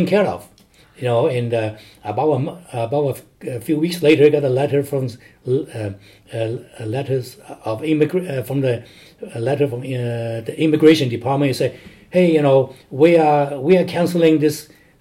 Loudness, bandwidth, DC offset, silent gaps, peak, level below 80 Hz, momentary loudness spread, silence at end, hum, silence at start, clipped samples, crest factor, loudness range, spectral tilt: -18 LUFS; 16 kHz; under 0.1%; none; 0 dBFS; -60 dBFS; 15 LU; 0.35 s; none; 0 s; under 0.1%; 18 dB; 7 LU; -7 dB/octave